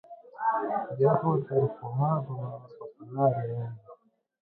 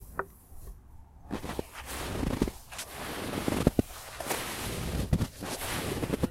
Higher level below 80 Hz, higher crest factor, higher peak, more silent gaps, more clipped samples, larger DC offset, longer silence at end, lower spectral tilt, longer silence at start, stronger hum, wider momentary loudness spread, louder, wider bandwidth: second, -70 dBFS vs -42 dBFS; second, 20 dB vs 26 dB; about the same, -10 dBFS vs -8 dBFS; neither; neither; neither; first, 0.45 s vs 0 s; first, -13 dB/octave vs -5 dB/octave; about the same, 0.1 s vs 0 s; neither; about the same, 19 LU vs 19 LU; first, -29 LUFS vs -34 LUFS; second, 4.1 kHz vs 16 kHz